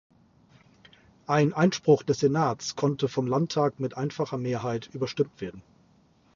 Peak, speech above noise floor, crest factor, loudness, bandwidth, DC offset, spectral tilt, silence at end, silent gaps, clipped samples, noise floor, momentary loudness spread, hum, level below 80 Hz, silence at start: -8 dBFS; 36 dB; 20 dB; -27 LUFS; 7.4 kHz; under 0.1%; -6 dB/octave; 0.75 s; none; under 0.1%; -62 dBFS; 10 LU; none; -64 dBFS; 1.3 s